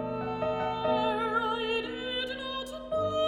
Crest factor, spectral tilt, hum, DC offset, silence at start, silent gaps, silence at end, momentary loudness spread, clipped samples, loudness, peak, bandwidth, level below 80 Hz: 14 dB; -5 dB/octave; none; under 0.1%; 0 s; none; 0 s; 6 LU; under 0.1%; -31 LUFS; -16 dBFS; 15 kHz; -56 dBFS